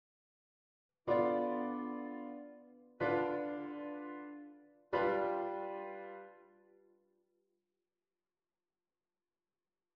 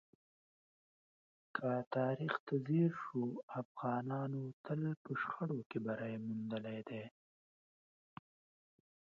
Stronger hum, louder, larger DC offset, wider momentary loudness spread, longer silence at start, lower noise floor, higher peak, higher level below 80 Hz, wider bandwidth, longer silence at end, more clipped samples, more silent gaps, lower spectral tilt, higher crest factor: neither; first, -38 LUFS vs -41 LUFS; neither; first, 19 LU vs 11 LU; second, 1.05 s vs 1.55 s; about the same, under -90 dBFS vs under -90 dBFS; about the same, -22 dBFS vs -22 dBFS; first, -78 dBFS vs -86 dBFS; second, 5.8 kHz vs 6.8 kHz; first, 3.55 s vs 2.1 s; neither; second, none vs 1.87-1.91 s, 2.40-2.47 s, 3.43-3.48 s, 3.65-3.75 s, 4.53-4.64 s, 4.97-5.05 s, 5.66-5.70 s; first, -8.5 dB/octave vs -7 dB/octave; about the same, 20 dB vs 20 dB